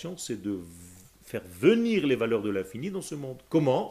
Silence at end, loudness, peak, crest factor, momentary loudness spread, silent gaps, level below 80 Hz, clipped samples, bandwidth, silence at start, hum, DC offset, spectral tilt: 0 s; -28 LUFS; -8 dBFS; 20 dB; 15 LU; none; -64 dBFS; under 0.1%; 15.5 kHz; 0 s; none; under 0.1%; -6 dB/octave